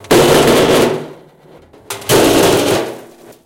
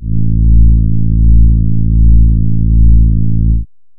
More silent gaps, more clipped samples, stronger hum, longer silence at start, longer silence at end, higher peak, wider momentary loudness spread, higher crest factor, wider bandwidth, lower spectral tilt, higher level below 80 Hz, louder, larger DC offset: neither; second, under 0.1% vs 0.3%; neither; about the same, 0.05 s vs 0 s; about the same, 0.4 s vs 0.35 s; about the same, -2 dBFS vs 0 dBFS; first, 18 LU vs 4 LU; about the same, 12 dB vs 8 dB; first, 17 kHz vs 0.5 kHz; second, -4 dB/octave vs -18 dB/octave; second, -38 dBFS vs -10 dBFS; about the same, -11 LUFS vs -11 LUFS; neither